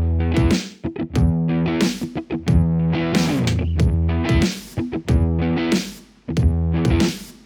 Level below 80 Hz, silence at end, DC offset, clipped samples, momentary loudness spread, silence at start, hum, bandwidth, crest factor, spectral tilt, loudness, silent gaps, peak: -26 dBFS; 0.15 s; under 0.1%; under 0.1%; 8 LU; 0 s; none; 18 kHz; 16 dB; -6.5 dB/octave; -20 LUFS; none; -4 dBFS